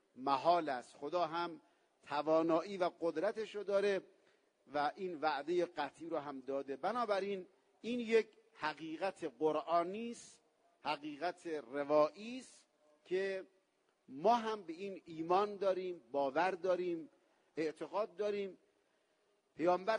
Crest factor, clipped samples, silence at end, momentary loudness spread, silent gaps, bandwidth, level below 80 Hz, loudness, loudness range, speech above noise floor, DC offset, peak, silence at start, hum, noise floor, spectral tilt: 20 dB; under 0.1%; 0 s; 13 LU; none; 10 kHz; -86 dBFS; -38 LUFS; 3 LU; 41 dB; under 0.1%; -20 dBFS; 0.15 s; none; -78 dBFS; -5.5 dB/octave